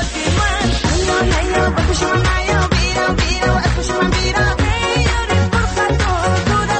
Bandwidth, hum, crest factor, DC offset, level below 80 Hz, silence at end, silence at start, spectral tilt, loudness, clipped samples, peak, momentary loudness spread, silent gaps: 8.8 kHz; none; 12 dB; under 0.1%; -22 dBFS; 0 s; 0 s; -4.5 dB/octave; -16 LUFS; under 0.1%; -2 dBFS; 1 LU; none